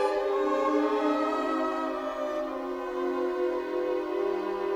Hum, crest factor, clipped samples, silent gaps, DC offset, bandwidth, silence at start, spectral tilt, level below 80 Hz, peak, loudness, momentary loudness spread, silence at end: none; 14 dB; under 0.1%; none; under 0.1%; 14 kHz; 0 s; -4.5 dB/octave; -62 dBFS; -14 dBFS; -29 LUFS; 6 LU; 0 s